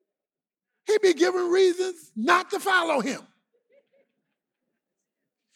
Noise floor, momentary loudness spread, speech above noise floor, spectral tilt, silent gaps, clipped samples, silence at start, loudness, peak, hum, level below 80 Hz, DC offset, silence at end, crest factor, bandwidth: under -90 dBFS; 10 LU; over 67 dB; -3 dB/octave; none; under 0.1%; 0.9 s; -23 LUFS; -6 dBFS; none; -88 dBFS; under 0.1%; 2.35 s; 20 dB; 14.5 kHz